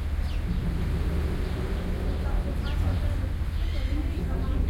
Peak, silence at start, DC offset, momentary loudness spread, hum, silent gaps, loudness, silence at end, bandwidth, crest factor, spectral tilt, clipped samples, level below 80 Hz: -16 dBFS; 0 s; under 0.1%; 3 LU; none; none; -30 LUFS; 0 s; 15.5 kHz; 12 dB; -7.5 dB/octave; under 0.1%; -28 dBFS